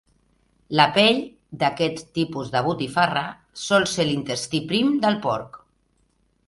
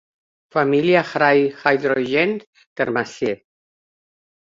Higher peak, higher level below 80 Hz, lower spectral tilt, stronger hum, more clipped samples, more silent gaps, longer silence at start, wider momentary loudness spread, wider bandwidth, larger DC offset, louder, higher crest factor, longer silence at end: about the same, 0 dBFS vs -2 dBFS; first, -58 dBFS vs -64 dBFS; second, -4.5 dB/octave vs -6 dB/octave; neither; neither; second, none vs 2.47-2.53 s, 2.66-2.76 s; first, 0.7 s vs 0.55 s; about the same, 9 LU vs 10 LU; first, 11.5 kHz vs 7.6 kHz; neither; second, -22 LUFS vs -19 LUFS; about the same, 22 dB vs 18 dB; second, 0.9 s vs 1.05 s